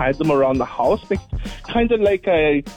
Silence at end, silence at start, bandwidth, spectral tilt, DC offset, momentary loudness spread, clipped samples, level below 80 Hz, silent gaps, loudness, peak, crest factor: 0 s; 0 s; 11.5 kHz; -7 dB/octave; under 0.1%; 8 LU; under 0.1%; -34 dBFS; none; -19 LUFS; -8 dBFS; 12 dB